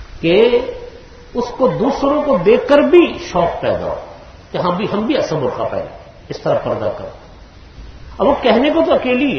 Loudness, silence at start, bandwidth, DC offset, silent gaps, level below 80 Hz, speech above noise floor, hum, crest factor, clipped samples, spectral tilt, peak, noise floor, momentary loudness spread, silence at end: -15 LUFS; 0 s; 6.6 kHz; under 0.1%; none; -40 dBFS; 24 dB; none; 16 dB; under 0.1%; -6.5 dB/octave; 0 dBFS; -39 dBFS; 17 LU; 0 s